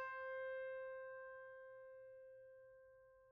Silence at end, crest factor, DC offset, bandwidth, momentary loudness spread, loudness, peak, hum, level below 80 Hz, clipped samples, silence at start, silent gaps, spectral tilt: 0 s; 14 dB; under 0.1%; 5.2 kHz; 18 LU; -52 LUFS; -40 dBFS; none; -88 dBFS; under 0.1%; 0 s; none; 0.5 dB/octave